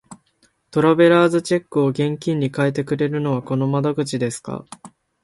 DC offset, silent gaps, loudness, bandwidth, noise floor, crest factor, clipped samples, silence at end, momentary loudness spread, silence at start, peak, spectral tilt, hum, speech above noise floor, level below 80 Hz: under 0.1%; none; -19 LUFS; 11.5 kHz; -62 dBFS; 16 dB; under 0.1%; 0.35 s; 12 LU; 0.1 s; -2 dBFS; -6.5 dB/octave; none; 44 dB; -62 dBFS